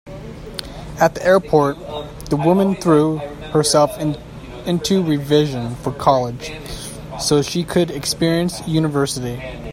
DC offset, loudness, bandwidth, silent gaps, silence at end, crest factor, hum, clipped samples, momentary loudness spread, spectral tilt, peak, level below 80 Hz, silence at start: under 0.1%; -18 LUFS; 16.5 kHz; none; 0 s; 18 dB; none; under 0.1%; 15 LU; -5 dB/octave; 0 dBFS; -40 dBFS; 0.05 s